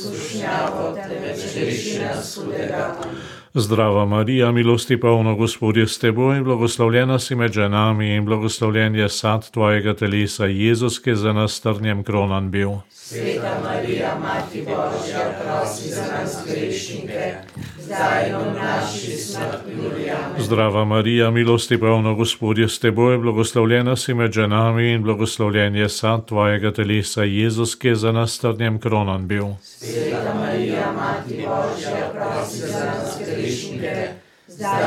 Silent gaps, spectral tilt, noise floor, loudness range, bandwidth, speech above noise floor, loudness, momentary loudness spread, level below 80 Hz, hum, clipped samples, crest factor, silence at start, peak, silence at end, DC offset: none; -5.5 dB/octave; -41 dBFS; 7 LU; 15 kHz; 21 dB; -20 LUFS; 10 LU; -56 dBFS; none; under 0.1%; 18 dB; 0 s; -2 dBFS; 0 s; under 0.1%